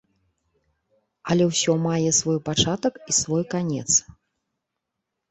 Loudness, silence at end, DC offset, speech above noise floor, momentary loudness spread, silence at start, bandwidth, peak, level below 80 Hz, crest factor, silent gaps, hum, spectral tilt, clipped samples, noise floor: -22 LUFS; 1.3 s; under 0.1%; 60 dB; 6 LU; 1.25 s; 8.4 kHz; -6 dBFS; -54 dBFS; 18 dB; none; none; -3.5 dB/octave; under 0.1%; -82 dBFS